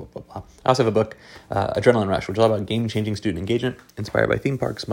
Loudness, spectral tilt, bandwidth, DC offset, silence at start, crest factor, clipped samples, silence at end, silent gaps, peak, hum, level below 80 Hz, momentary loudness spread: -22 LUFS; -6.5 dB/octave; 16.5 kHz; under 0.1%; 0 s; 22 dB; under 0.1%; 0 s; none; 0 dBFS; none; -48 dBFS; 13 LU